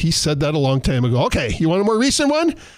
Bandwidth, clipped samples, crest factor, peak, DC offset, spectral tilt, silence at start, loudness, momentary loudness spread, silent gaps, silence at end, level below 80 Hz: 15.5 kHz; under 0.1%; 10 dB; -8 dBFS; under 0.1%; -5 dB/octave; 0 s; -18 LUFS; 3 LU; none; 0.1 s; -34 dBFS